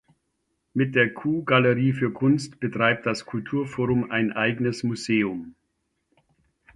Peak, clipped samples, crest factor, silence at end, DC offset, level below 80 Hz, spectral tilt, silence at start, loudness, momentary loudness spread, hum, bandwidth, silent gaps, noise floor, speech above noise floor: -6 dBFS; under 0.1%; 20 dB; 1.25 s; under 0.1%; -60 dBFS; -6.5 dB/octave; 0.75 s; -24 LUFS; 8 LU; none; 11.5 kHz; none; -75 dBFS; 52 dB